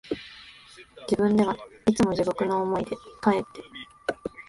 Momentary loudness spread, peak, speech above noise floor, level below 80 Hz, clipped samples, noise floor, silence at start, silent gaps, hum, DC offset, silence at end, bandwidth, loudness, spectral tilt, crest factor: 20 LU; -8 dBFS; 25 dB; -56 dBFS; under 0.1%; -50 dBFS; 0.05 s; none; none; under 0.1%; 0.05 s; 11.5 kHz; -26 LUFS; -6 dB/octave; 20 dB